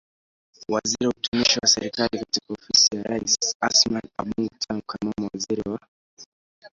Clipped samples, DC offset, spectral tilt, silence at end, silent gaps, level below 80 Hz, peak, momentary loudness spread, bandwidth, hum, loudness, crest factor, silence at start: under 0.1%; under 0.1%; -2 dB/octave; 0.05 s; 1.28-1.32 s, 3.55-3.60 s, 5.88-6.17 s, 6.26-6.62 s; -56 dBFS; -4 dBFS; 13 LU; 7.8 kHz; none; -22 LUFS; 20 dB; 0.7 s